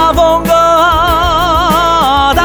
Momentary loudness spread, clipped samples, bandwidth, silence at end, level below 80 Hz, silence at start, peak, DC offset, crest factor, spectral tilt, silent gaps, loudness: 2 LU; under 0.1%; over 20 kHz; 0 s; -22 dBFS; 0 s; 0 dBFS; 0.5%; 8 dB; -4.5 dB/octave; none; -9 LUFS